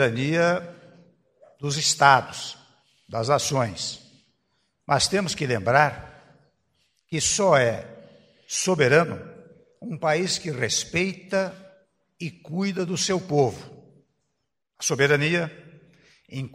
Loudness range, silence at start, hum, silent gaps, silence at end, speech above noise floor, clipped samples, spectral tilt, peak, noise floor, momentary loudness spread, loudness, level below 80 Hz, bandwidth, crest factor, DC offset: 4 LU; 0 s; none; none; 0.05 s; 56 dB; under 0.1%; -3.5 dB/octave; -2 dBFS; -79 dBFS; 18 LU; -23 LUFS; -60 dBFS; 15.5 kHz; 24 dB; under 0.1%